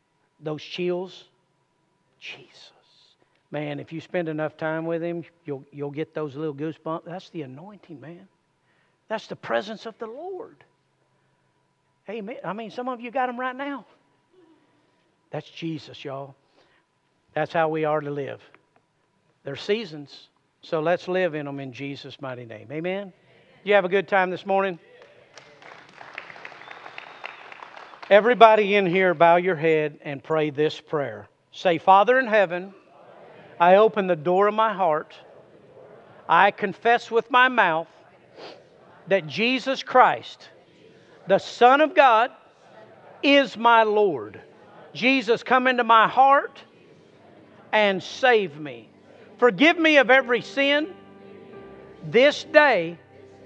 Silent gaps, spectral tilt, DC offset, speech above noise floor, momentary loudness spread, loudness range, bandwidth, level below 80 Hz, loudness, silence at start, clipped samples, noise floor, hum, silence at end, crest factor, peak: none; -5.5 dB/octave; under 0.1%; 47 dB; 23 LU; 15 LU; 8.2 kHz; -80 dBFS; -21 LUFS; 0.45 s; under 0.1%; -68 dBFS; none; 0.5 s; 24 dB; 0 dBFS